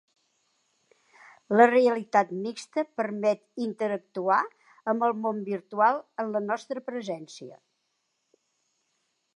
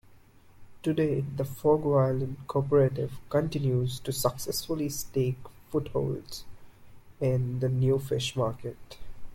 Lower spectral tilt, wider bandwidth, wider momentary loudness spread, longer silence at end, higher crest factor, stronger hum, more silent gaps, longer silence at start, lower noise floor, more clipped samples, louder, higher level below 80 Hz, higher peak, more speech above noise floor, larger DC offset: about the same, -5.5 dB/octave vs -6.5 dB/octave; second, 11 kHz vs 16.5 kHz; about the same, 15 LU vs 13 LU; first, 1.8 s vs 0 s; first, 24 dB vs 18 dB; neither; neither; first, 1.5 s vs 0.1 s; first, -77 dBFS vs -55 dBFS; neither; about the same, -27 LUFS vs -29 LUFS; second, -86 dBFS vs -52 dBFS; first, -4 dBFS vs -12 dBFS; first, 51 dB vs 27 dB; neither